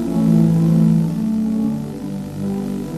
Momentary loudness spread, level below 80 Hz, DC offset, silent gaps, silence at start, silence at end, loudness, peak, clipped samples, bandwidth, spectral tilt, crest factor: 12 LU; -44 dBFS; under 0.1%; none; 0 s; 0 s; -18 LUFS; -4 dBFS; under 0.1%; 13 kHz; -9 dB/octave; 12 dB